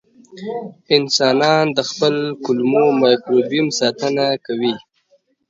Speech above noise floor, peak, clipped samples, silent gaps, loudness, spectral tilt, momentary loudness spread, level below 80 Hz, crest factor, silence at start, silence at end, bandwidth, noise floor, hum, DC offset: 43 dB; 0 dBFS; under 0.1%; none; -16 LUFS; -4.5 dB/octave; 14 LU; -66 dBFS; 18 dB; 0.35 s; 0.7 s; 7.8 kHz; -60 dBFS; none; under 0.1%